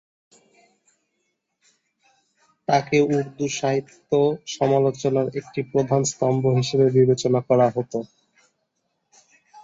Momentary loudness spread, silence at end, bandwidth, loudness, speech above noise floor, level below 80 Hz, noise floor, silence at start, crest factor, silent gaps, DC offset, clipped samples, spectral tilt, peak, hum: 9 LU; 0.05 s; 8 kHz; -21 LUFS; 54 dB; -62 dBFS; -75 dBFS; 2.7 s; 18 dB; none; under 0.1%; under 0.1%; -6 dB/octave; -4 dBFS; none